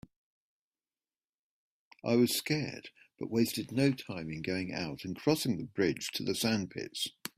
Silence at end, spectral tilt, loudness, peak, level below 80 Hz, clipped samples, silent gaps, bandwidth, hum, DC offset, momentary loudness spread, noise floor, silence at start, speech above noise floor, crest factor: 0.1 s; -4.5 dB/octave; -33 LUFS; -14 dBFS; -68 dBFS; under 0.1%; none; 16 kHz; none; under 0.1%; 11 LU; under -90 dBFS; 2.05 s; over 57 dB; 20 dB